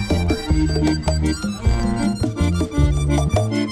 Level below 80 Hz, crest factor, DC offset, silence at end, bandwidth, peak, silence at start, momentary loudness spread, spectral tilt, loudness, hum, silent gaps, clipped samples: -24 dBFS; 14 dB; under 0.1%; 0 s; 13.5 kHz; -4 dBFS; 0 s; 3 LU; -6.5 dB/octave; -20 LUFS; none; none; under 0.1%